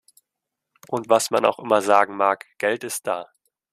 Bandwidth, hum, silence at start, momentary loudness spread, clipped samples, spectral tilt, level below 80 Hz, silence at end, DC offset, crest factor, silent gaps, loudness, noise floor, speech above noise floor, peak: 15 kHz; none; 0.9 s; 12 LU; under 0.1%; -3 dB/octave; -70 dBFS; 0.5 s; under 0.1%; 20 dB; none; -21 LUFS; -83 dBFS; 62 dB; -2 dBFS